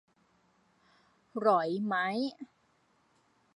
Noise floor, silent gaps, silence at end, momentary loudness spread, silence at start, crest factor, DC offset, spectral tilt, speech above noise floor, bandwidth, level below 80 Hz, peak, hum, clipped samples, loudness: -71 dBFS; none; 1.1 s; 20 LU; 1.35 s; 22 dB; under 0.1%; -6.5 dB/octave; 40 dB; 11 kHz; -84 dBFS; -12 dBFS; none; under 0.1%; -31 LUFS